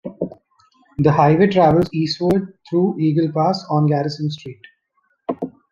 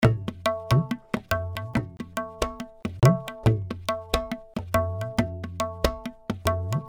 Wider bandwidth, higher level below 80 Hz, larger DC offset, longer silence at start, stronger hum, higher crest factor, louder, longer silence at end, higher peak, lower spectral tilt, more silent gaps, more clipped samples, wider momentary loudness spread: second, 7.2 kHz vs over 20 kHz; second, -50 dBFS vs -40 dBFS; neither; about the same, 0.05 s vs 0 s; neither; second, 18 dB vs 24 dB; first, -18 LUFS vs -27 LUFS; first, 0.25 s vs 0 s; first, 0 dBFS vs -4 dBFS; first, -8 dB/octave vs -6.5 dB/octave; neither; neither; first, 16 LU vs 12 LU